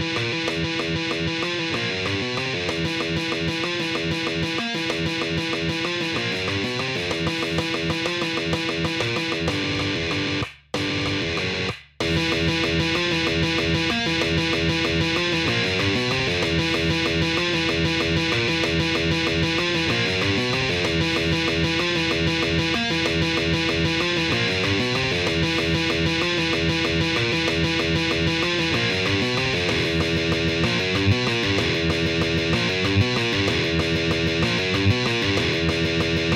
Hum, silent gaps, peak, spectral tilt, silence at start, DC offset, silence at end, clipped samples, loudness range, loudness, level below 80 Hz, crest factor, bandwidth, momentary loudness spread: none; none; -6 dBFS; -4.5 dB/octave; 0 s; under 0.1%; 0 s; under 0.1%; 3 LU; -22 LUFS; -40 dBFS; 16 dB; 15 kHz; 3 LU